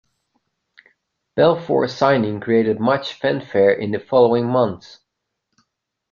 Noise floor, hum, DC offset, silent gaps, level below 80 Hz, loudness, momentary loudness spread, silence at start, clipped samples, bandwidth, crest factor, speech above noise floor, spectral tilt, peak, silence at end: -77 dBFS; none; under 0.1%; none; -60 dBFS; -18 LUFS; 7 LU; 1.35 s; under 0.1%; 7.2 kHz; 18 dB; 60 dB; -7 dB/octave; -2 dBFS; 1.35 s